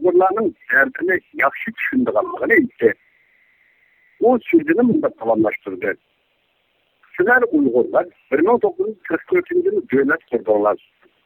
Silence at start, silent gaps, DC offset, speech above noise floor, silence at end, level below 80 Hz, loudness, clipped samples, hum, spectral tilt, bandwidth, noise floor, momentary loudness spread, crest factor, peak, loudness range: 0 s; none; under 0.1%; 47 dB; 0.5 s; -60 dBFS; -18 LUFS; under 0.1%; none; -9 dB/octave; 17.5 kHz; -65 dBFS; 9 LU; 16 dB; -2 dBFS; 2 LU